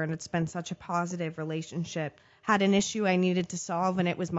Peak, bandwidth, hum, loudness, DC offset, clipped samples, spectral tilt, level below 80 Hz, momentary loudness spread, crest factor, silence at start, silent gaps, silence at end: -12 dBFS; 8 kHz; none; -30 LUFS; under 0.1%; under 0.1%; -5 dB/octave; -64 dBFS; 10 LU; 18 dB; 0 s; none; 0 s